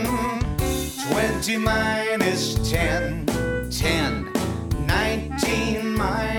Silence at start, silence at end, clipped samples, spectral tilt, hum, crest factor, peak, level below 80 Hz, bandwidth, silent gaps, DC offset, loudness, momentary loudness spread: 0 s; 0 s; under 0.1%; -4.5 dB/octave; none; 16 dB; -8 dBFS; -32 dBFS; over 20 kHz; none; under 0.1%; -23 LUFS; 4 LU